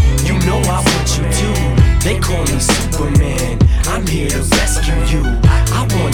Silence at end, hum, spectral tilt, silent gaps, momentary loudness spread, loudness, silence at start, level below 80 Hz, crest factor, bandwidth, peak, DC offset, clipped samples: 0 s; none; -4.5 dB/octave; none; 4 LU; -14 LUFS; 0 s; -16 dBFS; 12 dB; 19.5 kHz; 0 dBFS; under 0.1%; under 0.1%